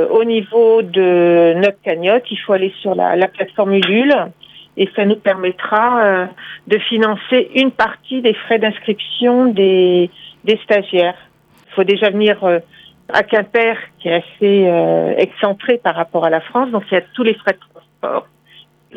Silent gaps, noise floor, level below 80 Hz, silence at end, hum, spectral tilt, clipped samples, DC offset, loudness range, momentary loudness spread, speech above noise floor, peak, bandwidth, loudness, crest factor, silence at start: none; -47 dBFS; -62 dBFS; 0.75 s; none; -7 dB/octave; under 0.1%; under 0.1%; 2 LU; 8 LU; 33 dB; 0 dBFS; 6.4 kHz; -14 LUFS; 14 dB; 0 s